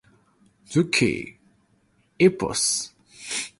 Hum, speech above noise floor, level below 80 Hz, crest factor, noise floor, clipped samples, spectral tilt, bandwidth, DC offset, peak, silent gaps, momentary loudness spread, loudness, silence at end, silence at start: none; 42 dB; -56 dBFS; 20 dB; -64 dBFS; under 0.1%; -3.5 dB/octave; 11.5 kHz; under 0.1%; -4 dBFS; none; 17 LU; -23 LUFS; 0.1 s; 0.7 s